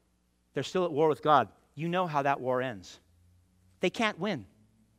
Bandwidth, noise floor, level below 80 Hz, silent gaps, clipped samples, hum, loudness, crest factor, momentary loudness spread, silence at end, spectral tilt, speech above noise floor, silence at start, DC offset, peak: 15.5 kHz; -72 dBFS; -72 dBFS; none; under 0.1%; none; -30 LUFS; 22 dB; 13 LU; 0.55 s; -5.5 dB/octave; 42 dB; 0.55 s; under 0.1%; -10 dBFS